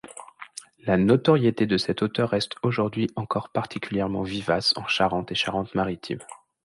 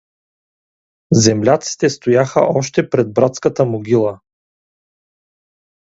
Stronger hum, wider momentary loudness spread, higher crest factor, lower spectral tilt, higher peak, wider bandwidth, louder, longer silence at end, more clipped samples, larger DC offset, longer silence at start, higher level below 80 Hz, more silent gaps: neither; first, 15 LU vs 5 LU; about the same, 18 dB vs 16 dB; about the same, -6 dB/octave vs -5.5 dB/octave; second, -6 dBFS vs 0 dBFS; first, 11.5 kHz vs 8 kHz; second, -24 LUFS vs -15 LUFS; second, 0.3 s vs 1.7 s; neither; neither; second, 0.05 s vs 1.1 s; about the same, -54 dBFS vs -52 dBFS; neither